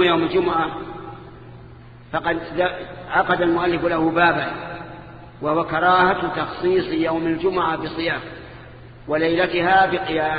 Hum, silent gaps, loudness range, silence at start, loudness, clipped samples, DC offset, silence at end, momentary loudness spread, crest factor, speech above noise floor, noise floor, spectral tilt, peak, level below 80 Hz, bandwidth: none; none; 3 LU; 0 s; -20 LUFS; under 0.1%; under 0.1%; 0 s; 20 LU; 18 dB; 22 dB; -42 dBFS; -8.5 dB/octave; -4 dBFS; -48 dBFS; 5 kHz